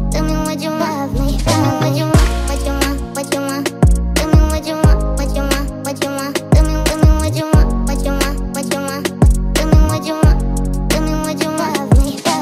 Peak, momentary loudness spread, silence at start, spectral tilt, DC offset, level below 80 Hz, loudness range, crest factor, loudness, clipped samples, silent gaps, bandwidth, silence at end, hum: 0 dBFS; 6 LU; 0 s; -5.5 dB/octave; under 0.1%; -18 dBFS; 1 LU; 14 dB; -16 LUFS; under 0.1%; none; 16 kHz; 0 s; none